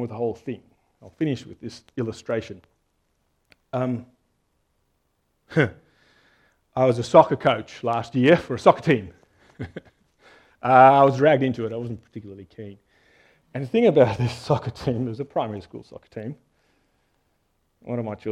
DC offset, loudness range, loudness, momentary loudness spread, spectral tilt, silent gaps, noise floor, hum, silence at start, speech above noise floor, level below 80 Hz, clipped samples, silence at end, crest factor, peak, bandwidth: under 0.1%; 13 LU; -21 LUFS; 23 LU; -7 dB/octave; none; -71 dBFS; none; 0 s; 49 dB; -58 dBFS; under 0.1%; 0 s; 24 dB; 0 dBFS; 11 kHz